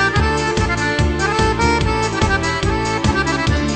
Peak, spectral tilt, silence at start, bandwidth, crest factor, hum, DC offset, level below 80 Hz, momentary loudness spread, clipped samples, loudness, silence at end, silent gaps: -2 dBFS; -5 dB/octave; 0 s; 9.2 kHz; 14 dB; none; under 0.1%; -24 dBFS; 2 LU; under 0.1%; -17 LUFS; 0 s; none